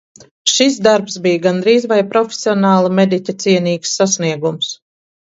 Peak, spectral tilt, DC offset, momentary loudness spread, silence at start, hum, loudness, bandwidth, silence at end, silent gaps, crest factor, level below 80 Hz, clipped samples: 0 dBFS; -4 dB/octave; under 0.1%; 6 LU; 0.45 s; none; -14 LUFS; 8 kHz; 0.55 s; none; 14 dB; -62 dBFS; under 0.1%